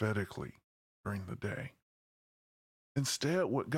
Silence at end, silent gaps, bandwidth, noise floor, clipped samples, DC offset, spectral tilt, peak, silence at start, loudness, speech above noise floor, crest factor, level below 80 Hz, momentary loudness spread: 0 s; 0.64-1.04 s, 1.82-2.95 s; 16.5 kHz; under -90 dBFS; under 0.1%; under 0.1%; -5 dB/octave; -20 dBFS; 0 s; -37 LUFS; over 54 dB; 18 dB; -68 dBFS; 14 LU